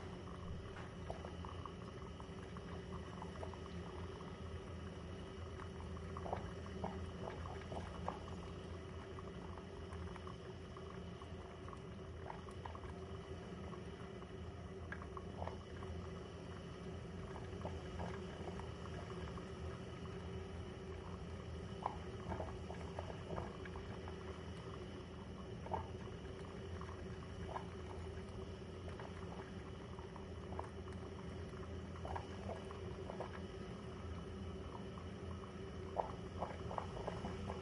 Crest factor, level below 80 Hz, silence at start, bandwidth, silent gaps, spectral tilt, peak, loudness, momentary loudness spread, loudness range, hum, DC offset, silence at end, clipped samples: 26 dB; -58 dBFS; 0 s; 11 kHz; none; -6.5 dB/octave; -22 dBFS; -49 LUFS; 5 LU; 3 LU; none; under 0.1%; 0 s; under 0.1%